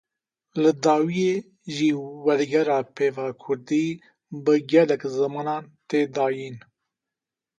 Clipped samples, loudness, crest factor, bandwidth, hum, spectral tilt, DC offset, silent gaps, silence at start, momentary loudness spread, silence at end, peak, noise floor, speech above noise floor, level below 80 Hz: under 0.1%; -23 LUFS; 18 dB; 9 kHz; none; -6 dB/octave; under 0.1%; none; 0.55 s; 13 LU; 1 s; -6 dBFS; -88 dBFS; 65 dB; -72 dBFS